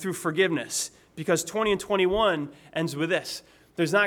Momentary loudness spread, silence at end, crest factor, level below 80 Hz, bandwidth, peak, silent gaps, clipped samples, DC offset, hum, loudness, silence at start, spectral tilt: 11 LU; 0 s; 16 dB; -54 dBFS; 19 kHz; -10 dBFS; none; under 0.1%; under 0.1%; none; -26 LUFS; 0 s; -4 dB/octave